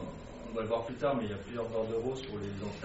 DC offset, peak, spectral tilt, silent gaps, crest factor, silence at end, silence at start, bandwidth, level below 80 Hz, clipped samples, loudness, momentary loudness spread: under 0.1%; -20 dBFS; -5.5 dB/octave; none; 16 dB; 0 s; 0 s; 7.6 kHz; -54 dBFS; under 0.1%; -36 LUFS; 8 LU